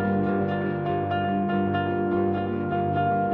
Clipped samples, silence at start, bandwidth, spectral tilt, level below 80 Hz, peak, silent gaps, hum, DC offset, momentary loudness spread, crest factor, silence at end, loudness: under 0.1%; 0 s; 4.5 kHz; -10.5 dB/octave; -56 dBFS; -12 dBFS; none; none; under 0.1%; 3 LU; 12 dB; 0 s; -25 LUFS